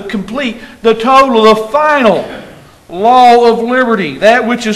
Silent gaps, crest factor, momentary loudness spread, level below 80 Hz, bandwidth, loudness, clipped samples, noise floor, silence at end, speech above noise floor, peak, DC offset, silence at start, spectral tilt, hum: none; 10 dB; 13 LU; -44 dBFS; 13 kHz; -9 LUFS; 2%; -35 dBFS; 0 s; 26 dB; 0 dBFS; under 0.1%; 0 s; -5 dB/octave; none